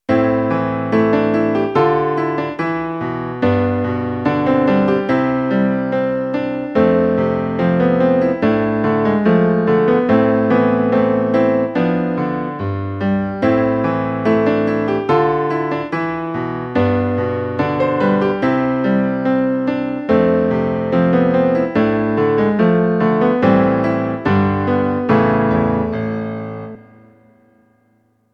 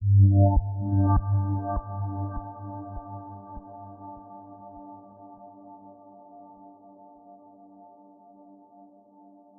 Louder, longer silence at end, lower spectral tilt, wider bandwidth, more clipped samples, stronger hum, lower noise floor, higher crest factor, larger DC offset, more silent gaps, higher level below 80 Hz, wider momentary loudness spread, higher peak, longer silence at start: first, -16 LUFS vs -25 LUFS; second, 1.5 s vs 3.15 s; first, -9.5 dB/octave vs -7.5 dB/octave; first, 6.2 kHz vs 1.7 kHz; neither; neither; first, -59 dBFS vs -54 dBFS; about the same, 16 dB vs 18 dB; neither; neither; second, -46 dBFS vs -40 dBFS; second, 7 LU vs 27 LU; first, 0 dBFS vs -10 dBFS; about the same, 0.1 s vs 0 s